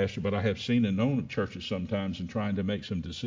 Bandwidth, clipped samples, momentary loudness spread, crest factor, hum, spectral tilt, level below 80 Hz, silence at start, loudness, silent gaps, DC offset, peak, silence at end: 7.6 kHz; under 0.1%; 6 LU; 16 dB; none; -7 dB/octave; -50 dBFS; 0 s; -30 LUFS; none; under 0.1%; -14 dBFS; 0 s